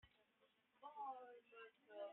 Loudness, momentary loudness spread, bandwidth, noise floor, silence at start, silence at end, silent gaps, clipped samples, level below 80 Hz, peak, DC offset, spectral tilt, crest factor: -58 LUFS; 10 LU; 3.9 kHz; -81 dBFS; 0.05 s; 0 s; none; under 0.1%; under -90 dBFS; -42 dBFS; under 0.1%; 2 dB/octave; 16 dB